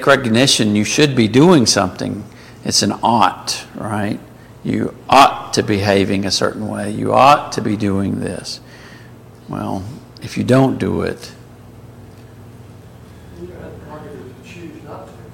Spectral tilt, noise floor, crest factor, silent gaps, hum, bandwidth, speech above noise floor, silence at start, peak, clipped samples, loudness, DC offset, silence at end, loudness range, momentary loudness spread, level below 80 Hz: -4.5 dB/octave; -39 dBFS; 18 dB; none; 60 Hz at -45 dBFS; 17 kHz; 24 dB; 0 s; 0 dBFS; under 0.1%; -15 LUFS; under 0.1%; 0 s; 20 LU; 24 LU; -48 dBFS